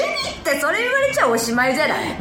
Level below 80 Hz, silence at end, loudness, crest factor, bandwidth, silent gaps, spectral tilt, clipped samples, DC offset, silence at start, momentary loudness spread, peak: -48 dBFS; 0 s; -18 LUFS; 16 dB; 19.5 kHz; none; -2.5 dB/octave; under 0.1%; under 0.1%; 0 s; 4 LU; -4 dBFS